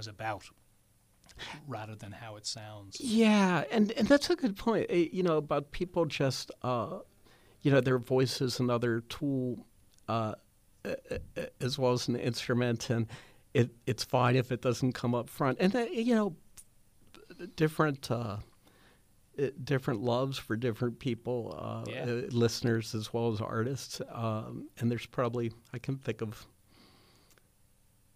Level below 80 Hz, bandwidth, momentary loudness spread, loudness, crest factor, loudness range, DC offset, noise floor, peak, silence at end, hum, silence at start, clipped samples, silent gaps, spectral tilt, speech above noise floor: -60 dBFS; 15.5 kHz; 14 LU; -32 LUFS; 22 dB; 7 LU; under 0.1%; -67 dBFS; -10 dBFS; 1.7 s; none; 0 s; under 0.1%; none; -6 dB/octave; 35 dB